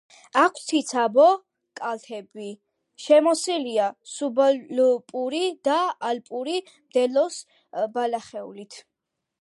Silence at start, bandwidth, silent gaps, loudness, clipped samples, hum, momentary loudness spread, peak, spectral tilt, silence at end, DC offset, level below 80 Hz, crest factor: 0.35 s; 11.5 kHz; none; -23 LUFS; under 0.1%; none; 19 LU; -6 dBFS; -3 dB/octave; 0.6 s; under 0.1%; -82 dBFS; 18 dB